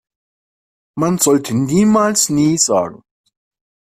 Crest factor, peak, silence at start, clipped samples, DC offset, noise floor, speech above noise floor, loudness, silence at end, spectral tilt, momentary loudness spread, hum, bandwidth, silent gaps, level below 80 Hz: 16 dB; 0 dBFS; 0.95 s; under 0.1%; under 0.1%; under -90 dBFS; over 76 dB; -14 LUFS; 1.05 s; -4.5 dB/octave; 8 LU; none; 16 kHz; none; -52 dBFS